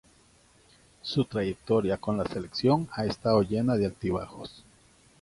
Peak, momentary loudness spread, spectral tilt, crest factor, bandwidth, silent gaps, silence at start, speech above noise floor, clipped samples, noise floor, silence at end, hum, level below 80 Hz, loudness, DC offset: -10 dBFS; 11 LU; -7 dB/octave; 20 dB; 11.5 kHz; none; 1.05 s; 33 dB; under 0.1%; -61 dBFS; 0.6 s; none; -54 dBFS; -28 LUFS; under 0.1%